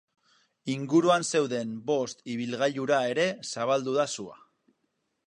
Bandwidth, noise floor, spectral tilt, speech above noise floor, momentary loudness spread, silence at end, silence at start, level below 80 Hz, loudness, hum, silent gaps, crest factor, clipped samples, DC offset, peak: 11 kHz; -77 dBFS; -4.5 dB/octave; 50 dB; 11 LU; 0.95 s; 0.65 s; -78 dBFS; -28 LUFS; none; none; 18 dB; under 0.1%; under 0.1%; -10 dBFS